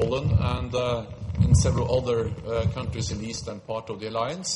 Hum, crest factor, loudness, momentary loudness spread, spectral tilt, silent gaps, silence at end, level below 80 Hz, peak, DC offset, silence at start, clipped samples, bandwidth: none; 18 dB; -26 LUFS; 12 LU; -5.5 dB/octave; none; 0 s; -38 dBFS; -8 dBFS; under 0.1%; 0 s; under 0.1%; 11 kHz